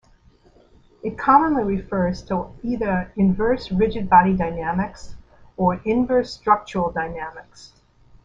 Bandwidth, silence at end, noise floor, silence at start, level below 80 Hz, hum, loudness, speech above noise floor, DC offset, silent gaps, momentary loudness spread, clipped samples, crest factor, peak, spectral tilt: 7.6 kHz; 0.6 s; -54 dBFS; 1.05 s; -42 dBFS; none; -21 LUFS; 33 dB; under 0.1%; none; 14 LU; under 0.1%; 20 dB; -2 dBFS; -7.5 dB/octave